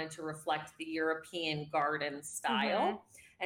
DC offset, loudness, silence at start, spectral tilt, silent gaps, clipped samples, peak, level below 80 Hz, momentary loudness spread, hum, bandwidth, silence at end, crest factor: under 0.1%; -35 LUFS; 0 s; -3.5 dB/octave; none; under 0.1%; -20 dBFS; -78 dBFS; 9 LU; none; 17.5 kHz; 0 s; 16 dB